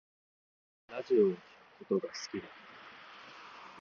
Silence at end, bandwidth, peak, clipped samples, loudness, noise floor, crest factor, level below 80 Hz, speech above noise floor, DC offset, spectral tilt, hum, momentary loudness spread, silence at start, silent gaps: 0 s; 7.2 kHz; -16 dBFS; under 0.1%; -34 LUFS; -53 dBFS; 20 dB; -80 dBFS; 20 dB; under 0.1%; -5.5 dB/octave; none; 22 LU; 0.9 s; none